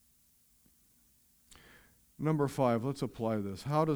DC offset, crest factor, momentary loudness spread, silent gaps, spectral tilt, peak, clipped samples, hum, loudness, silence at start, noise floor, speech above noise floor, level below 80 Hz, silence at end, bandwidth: under 0.1%; 20 dB; 7 LU; none; -7.5 dB/octave; -16 dBFS; under 0.1%; none; -33 LUFS; 2.2 s; -68 dBFS; 36 dB; -66 dBFS; 0 s; over 20 kHz